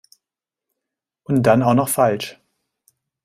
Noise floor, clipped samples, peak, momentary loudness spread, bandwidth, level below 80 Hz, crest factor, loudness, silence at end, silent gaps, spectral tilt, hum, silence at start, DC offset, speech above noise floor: -87 dBFS; under 0.1%; -2 dBFS; 11 LU; 16 kHz; -56 dBFS; 18 dB; -17 LUFS; 0.9 s; none; -6 dB/octave; none; 1.3 s; under 0.1%; 71 dB